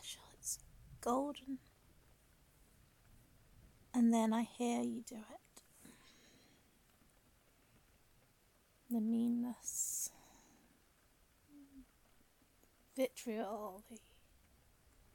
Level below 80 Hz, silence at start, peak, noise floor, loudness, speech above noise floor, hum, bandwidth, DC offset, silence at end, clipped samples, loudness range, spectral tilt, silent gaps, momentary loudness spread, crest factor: -72 dBFS; 0 s; -24 dBFS; -72 dBFS; -40 LUFS; 34 dB; none; 17.5 kHz; under 0.1%; 1.15 s; under 0.1%; 9 LU; -4 dB/octave; none; 26 LU; 20 dB